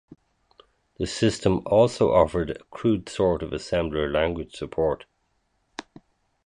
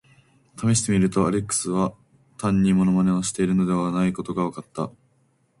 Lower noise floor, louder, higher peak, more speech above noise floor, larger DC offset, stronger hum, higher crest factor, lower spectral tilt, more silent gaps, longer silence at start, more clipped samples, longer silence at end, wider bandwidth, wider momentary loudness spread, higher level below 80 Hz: first, -71 dBFS vs -64 dBFS; about the same, -24 LUFS vs -23 LUFS; about the same, -6 dBFS vs -8 dBFS; first, 48 dB vs 43 dB; neither; neither; about the same, 20 dB vs 16 dB; about the same, -6 dB/octave vs -6 dB/octave; neither; first, 1 s vs 0.55 s; neither; about the same, 0.65 s vs 0.7 s; about the same, 11 kHz vs 11.5 kHz; first, 14 LU vs 10 LU; first, -44 dBFS vs -50 dBFS